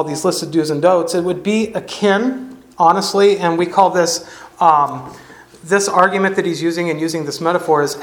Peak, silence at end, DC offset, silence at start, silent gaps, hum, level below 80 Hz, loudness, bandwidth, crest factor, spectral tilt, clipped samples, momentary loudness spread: 0 dBFS; 0 s; under 0.1%; 0 s; none; none; -58 dBFS; -16 LUFS; 18 kHz; 16 dB; -4.5 dB/octave; under 0.1%; 9 LU